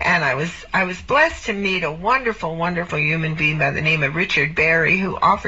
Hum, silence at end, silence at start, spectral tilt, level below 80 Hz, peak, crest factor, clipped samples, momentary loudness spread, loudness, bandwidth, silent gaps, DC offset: none; 0 s; 0 s; -3 dB/octave; -42 dBFS; -2 dBFS; 16 dB; under 0.1%; 7 LU; -18 LUFS; 8 kHz; none; 0.3%